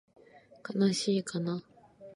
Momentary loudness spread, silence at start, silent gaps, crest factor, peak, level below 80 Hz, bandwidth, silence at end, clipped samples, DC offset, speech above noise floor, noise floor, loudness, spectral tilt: 12 LU; 0.35 s; none; 18 dB; -16 dBFS; -78 dBFS; 11.5 kHz; 0 s; under 0.1%; under 0.1%; 21 dB; -51 dBFS; -31 LUFS; -5.5 dB/octave